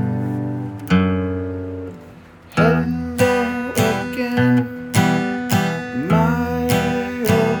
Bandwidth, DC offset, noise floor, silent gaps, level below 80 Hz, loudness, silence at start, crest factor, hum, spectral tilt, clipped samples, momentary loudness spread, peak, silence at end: over 20 kHz; under 0.1%; -41 dBFS; none; -46 dBFS; -19 LUFS; 0 s; 18 dB; none; -6 dB/octave; under 0.1%; 9 LU; 0 dBFS; 0 s